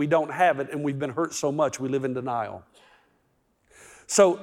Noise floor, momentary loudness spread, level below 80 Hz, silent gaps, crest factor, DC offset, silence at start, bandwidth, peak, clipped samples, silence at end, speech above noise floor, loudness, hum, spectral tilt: -69 dBFS; 10 LU; -70 dBFS; none; 20 dB; under 0.1%; 0 s; 17 kHz; -6 dBFS; under 0.1%; 0 s; 44 dB; -25 LUFS; none; -4.5 dB/octave